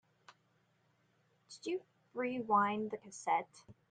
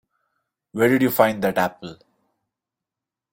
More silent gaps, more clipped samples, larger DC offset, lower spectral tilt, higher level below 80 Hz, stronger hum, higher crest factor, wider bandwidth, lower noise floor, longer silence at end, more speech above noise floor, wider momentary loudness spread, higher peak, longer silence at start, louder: neither; neither; neither; second, -4.5 dB/octave vs -6 dB/octave; second, -84 dBFS vs -62 dBFS; neither; about the same, 22 dB vs 24 dB; second, 9.6 kHz vs 16.5 kHz; second, -75 dBFS vs -87 dBFS; second, 0.2 s vs 1.4 s; second, 38 dB vs 68 dB; second, 16 LU vs 20 LU; second, -18 dBFS vs 0 dBFS; second, 0.3 s vs 0.75 s; second, -37 LUFS vs -20 LUFS